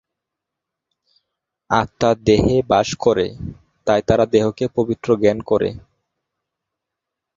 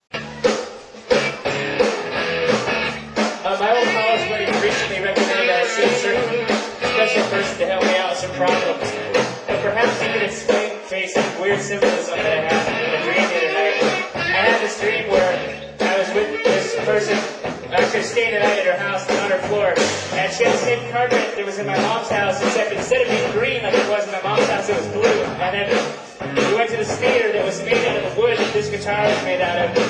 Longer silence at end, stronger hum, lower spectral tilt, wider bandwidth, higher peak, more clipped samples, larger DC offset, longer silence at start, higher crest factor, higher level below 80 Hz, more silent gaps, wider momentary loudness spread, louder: first, 1.55 s vs 0 s; neither; first, -6 dB/octave vs -3.5 dB/octave; second, 7.6 kHz vs 11 kHz; about the same, 0 dBFS vs -2 dBFS; neither; neither; first, 1.7 s vs 0.15 s; about the same, 20 dB vs 18 dB; first, -42 dBFS vs -52 dBFS; neither; first, 9 LU vs 5 LU; about the same, -18 LUFS vs -19 LUFS